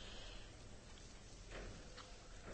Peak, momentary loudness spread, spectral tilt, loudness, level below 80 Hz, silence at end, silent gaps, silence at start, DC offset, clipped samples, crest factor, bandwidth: -40 dBFS; 5 LU; -3.5 dB/octave; -56 LUFS; -58 dBFS; 0 s; none; 0 s; under 0.1%; under 0.1%; 14 dB; 8.4 kHz